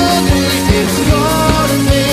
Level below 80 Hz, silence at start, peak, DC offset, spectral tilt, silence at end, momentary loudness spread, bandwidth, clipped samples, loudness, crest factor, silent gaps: -20 dBFS; 0 s; 0 dBFS; under 0.1%; -4.5 dB/octave; 0 s; 1 LU; 15.5 kHz; under 0.1%; -12 LUFS; 12 dB; none